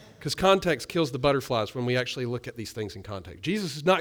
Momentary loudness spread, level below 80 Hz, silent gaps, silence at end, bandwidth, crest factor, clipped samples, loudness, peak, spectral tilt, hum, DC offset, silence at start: 13 LU; -52 dBFS; none; 0 s; over 20 kHz; 18 dB; under 0.1%; -27 LUFS; -8 dBFS; -5 dB/octave; none; under 0.1%; 0 s